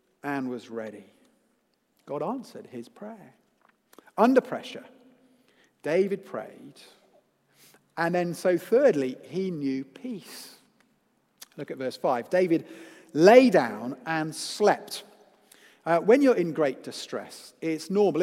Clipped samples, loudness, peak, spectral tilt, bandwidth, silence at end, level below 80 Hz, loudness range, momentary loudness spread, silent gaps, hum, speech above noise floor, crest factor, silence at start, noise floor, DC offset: under 0.1%; -25 LUFS; -2 dBFS; -5.5 dB/octave; 16 kHz; 0 s; -82 dBFS; 11 LU; 22 LU; none; none; 46 dB; 24 dB; 0.25 s; -71 dBFS; under 0.1%